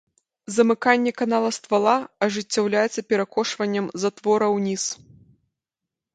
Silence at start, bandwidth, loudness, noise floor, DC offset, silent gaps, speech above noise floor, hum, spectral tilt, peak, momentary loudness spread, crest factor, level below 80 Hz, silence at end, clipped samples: 0.5 s; 9.4 kHz; -22 LUFS; -86 dBFS; under 0.1%; none; 65 dB; none; -4 dB/octave; -2 dBFS; 6 LU; 20 dB; -70 dBFS; 1.2 s; under 0.1%